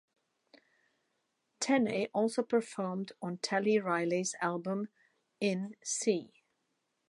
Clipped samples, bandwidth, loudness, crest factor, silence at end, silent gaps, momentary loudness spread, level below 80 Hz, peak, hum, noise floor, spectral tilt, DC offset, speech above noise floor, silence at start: under 0.1%; 11.5 kHz; -33 LUFS; 20 dB; 0.85 s; none; 8 LU; -82 dBFS; -16 dBFS; none; -81 dBFS; -4.5 dB/octave; under 0.1%; 48 dB; 1.6 s